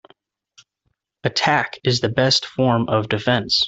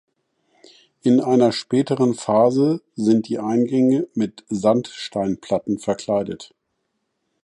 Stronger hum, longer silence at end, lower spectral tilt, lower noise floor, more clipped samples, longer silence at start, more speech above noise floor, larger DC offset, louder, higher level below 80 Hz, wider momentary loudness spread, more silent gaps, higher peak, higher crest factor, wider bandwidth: neither; second, 0 s vs 1 s; second, -4.5 dB/octave vs -6.5 dB/octave; about the same, -72 dBFS vs -74 dBFS; neither; first, 1.25 s vs 1.05 s; about the same, 53 dB vs 55 dB; neither; about the same, -19 LUFS vs -20 LUFS; first, -54 dBFS vs -60 dBFS; second, 4 LU vs 8 LU; neither; about the same, -2 dBFS vs -4 dBFS; about the same, 18 dB vs 16 dB; second, 8 kHz vs 11 kHz